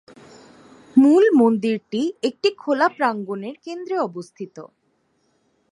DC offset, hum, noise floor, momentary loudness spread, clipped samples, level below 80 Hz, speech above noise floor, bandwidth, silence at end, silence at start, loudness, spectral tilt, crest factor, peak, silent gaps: under 0.1%; none; -67 dBFS; 19 LU; under 0.1%; -74 dBFS; 47 dB; 11 kHz; 1.05 s; 0.95 s; -19 LUFS; -6 dB/octave; 18 dB; -4 dBFS; none